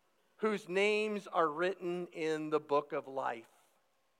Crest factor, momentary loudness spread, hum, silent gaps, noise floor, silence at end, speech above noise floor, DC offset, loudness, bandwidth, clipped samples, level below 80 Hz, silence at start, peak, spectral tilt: 18 dB; 8 LU; none; none; -76 dBFS; 0.8 s; 41 dB; under 0.1%; -35 LUFS; 12.5 kHz; under 0.1%; under -90 dBFS; 0.4 s; -18 dBFS; -5 dB/octave